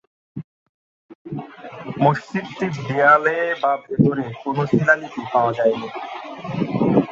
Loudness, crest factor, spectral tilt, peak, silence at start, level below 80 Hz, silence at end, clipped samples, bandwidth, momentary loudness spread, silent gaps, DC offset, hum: -19 LUFS; 20 dB; -7.5 dB/octave; -2 dBFS; 0.35 s; -58 dBFS; 0 s; under 0.1%; 7.6 kHz; 18 LU; 0.44-1.09 s, 1.15-1.25 s; under 0.1%; none